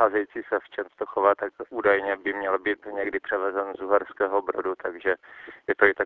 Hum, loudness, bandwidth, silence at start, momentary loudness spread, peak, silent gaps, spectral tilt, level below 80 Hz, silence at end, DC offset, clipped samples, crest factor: none; -26 LUFS; 4.2 kHz; 0 s; 9 LU; -4 dBFS; none; -7.5 dB/octave; -64 dBFS; 0 s; under 0.1%; under 0.1%; 22 dB